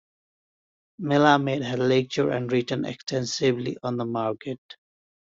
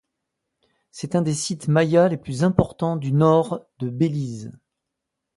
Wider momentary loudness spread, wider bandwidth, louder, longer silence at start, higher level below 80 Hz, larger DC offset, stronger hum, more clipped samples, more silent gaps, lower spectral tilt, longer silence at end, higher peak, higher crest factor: second, 11 LU vs 14 LU; second, 7.8 kHz vs 11.5 kHz; second, -25 LUFS vs -21 LUFS; about the same, 1 s vs 0.95 s; second, -66 dBFS vs -50 dBFS; neither; neither; neither; first, 4.58-4.69 s vs none; about the same, -5.5 dB/octave vs -6.5 dB/octave; second, 0.55 s vs 0.85 s; second, -6 dBFS vs -2 dBFS; about the same, 20 dB vs 20 dB